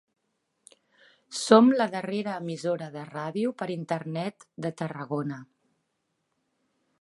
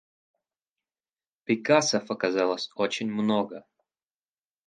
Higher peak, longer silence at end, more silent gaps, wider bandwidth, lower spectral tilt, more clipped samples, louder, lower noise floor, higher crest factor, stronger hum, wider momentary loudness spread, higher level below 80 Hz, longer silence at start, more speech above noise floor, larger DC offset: first, -2 dBFS vs -6 dBFS; first, 1.6 s vs 1.1 s; neither; first, 11.5 kHz vs 9.6 kHz; first, -5.5 dB/octave vs -4 dB/octave; neither; about the same, -27 LUFS vs -26 LUFS; second, -78 dBFS vs under -90 dBFS; about the same, 26 dB vs 24 dB; neither; first, 17 LU vs 11 LU; about the same, -80 dBFS vs -76 dBFS; second, 1.3 s vs 1.5 s; second, 51 dB vs over 64 dB; neither